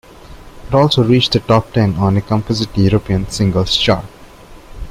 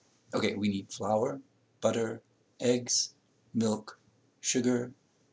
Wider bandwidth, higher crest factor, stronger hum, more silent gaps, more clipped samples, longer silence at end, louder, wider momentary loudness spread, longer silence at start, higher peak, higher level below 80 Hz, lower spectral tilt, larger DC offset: first, 14.5 kHz vs 8 kHz; second, 14 dB vs 20 dB; neither; neither; neither; second, 0 s vs 0.4 s; first, -14 LUFS vs -31 LUFS; about the same, 7 LU vs 9 LU; about the same, 0.25 s vs 0.3 s; first, -2 dBFS vs -14 dBFS; first, -34 dBFS vs -70 dBFS; first, -6 dB/octave vs -4 dB/octave; neither